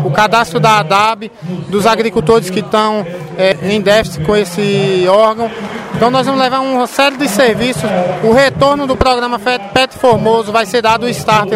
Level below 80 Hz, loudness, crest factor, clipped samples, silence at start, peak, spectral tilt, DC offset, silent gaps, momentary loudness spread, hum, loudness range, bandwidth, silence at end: -36 dBFS; -12 LUFS; 12 dB; 0.2%; 0 s; 0 dBFS; -5 dB/octave; under 0.1%; none; 6 LU; none; 1 LU; 16.5 kHz; 0 s